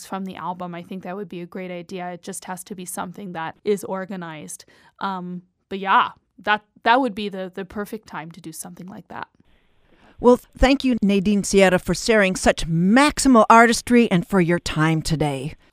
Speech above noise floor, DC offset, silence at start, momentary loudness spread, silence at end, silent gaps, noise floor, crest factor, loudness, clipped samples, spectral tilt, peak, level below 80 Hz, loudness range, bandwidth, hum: 37 dB; under 0.1%; 0 s; 19 LU; 0.2 s; none; -58 dBFS; 20 dB; -19 LUFS; under 0.1%; -5 dB/octave; 0 dBFS; -40 dBFS; 14 LU; 15.5 kHz; none